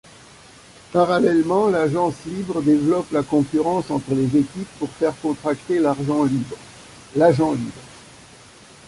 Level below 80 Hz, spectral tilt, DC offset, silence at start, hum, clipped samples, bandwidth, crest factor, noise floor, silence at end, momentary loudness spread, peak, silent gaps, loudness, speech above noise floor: -54 dBFS; -7 dB/octave; under 0.1%; 0.9 s; none; under 0.1%; 11.5 kHz; 18 dB; -46 dBFS; 0.9 s; 12 LU; -2 dBFS; none; -20 LUFS; 26 dB